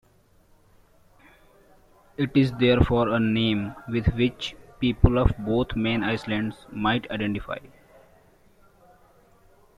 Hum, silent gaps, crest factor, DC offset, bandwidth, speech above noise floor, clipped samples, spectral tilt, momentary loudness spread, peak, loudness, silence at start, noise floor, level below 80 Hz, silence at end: none; none; 24 dB; under 0.1%; 11.5 kHz; 36 dB; under 0.1%; -7.5 dB/octave; 12 LU; -2 dBFS; -24 LUFS; 2.2 s; -59 dBFS; -38 dBFS; 2.1 s